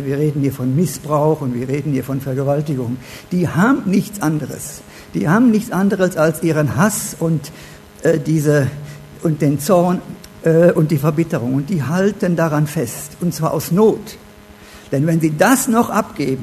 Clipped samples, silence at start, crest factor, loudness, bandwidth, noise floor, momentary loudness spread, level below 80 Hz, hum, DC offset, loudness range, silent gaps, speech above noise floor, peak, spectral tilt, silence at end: under 0.1%; 0 s; 16 dB; -17 LUFS; 13.5 kHz; -41 dBFS; 10 LU; -48 dBFS; none; under 0.1%; 3 LU; none; 24 dB; 0 dBFS; -6.5 dB/octave; 0 s